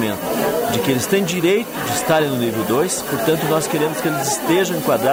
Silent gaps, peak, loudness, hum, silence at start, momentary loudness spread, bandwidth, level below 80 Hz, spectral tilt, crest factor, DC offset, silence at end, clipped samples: none; -6 dBFS; -18 LUFS; none; 0 s; 3 LU; 16.5 kHz; -52 dBFS; -4 dB/octave; 12 dB; under 0.1%; 0 s; under 0.1%